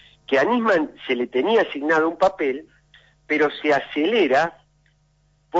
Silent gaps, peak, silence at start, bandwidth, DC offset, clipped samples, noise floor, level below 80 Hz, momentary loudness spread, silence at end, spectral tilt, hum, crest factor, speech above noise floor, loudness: none; -6 dBFS; 0.3 s; 7.8 kHz; under 0.1%; under 0.1%; -62 dBFS; -62 dBFS; 7 LU; 0 s; -5 dB/octave; none; 16 dB; 42 dB; -21 LUFS